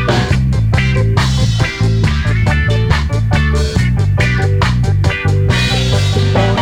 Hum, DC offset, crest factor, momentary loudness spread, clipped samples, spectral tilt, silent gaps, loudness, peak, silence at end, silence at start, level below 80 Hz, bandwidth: none; under 0.1%; 12 dB; 2 LU; under 0.1%; -6 dB/octave; none; -13 LUFS; 0 dBFS; 0 s; 0 s; -20 dBFS; 12 kHz